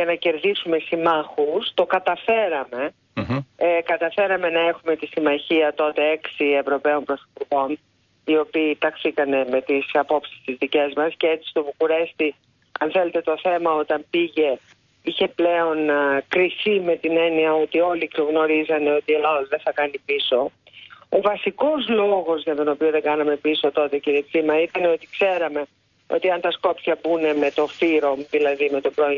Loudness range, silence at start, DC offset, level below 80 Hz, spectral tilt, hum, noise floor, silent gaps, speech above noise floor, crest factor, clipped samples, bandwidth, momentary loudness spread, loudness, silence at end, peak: 2 LU; 0 s; under 0.1%; -64 dBFS; -6.5 dB/octave; none; -46 dBFS; none; 25 dB; 14 dB; under 0.1%; 6.8 kHz; 6 LU; -21 LUFS; 0 s; -6 dBFS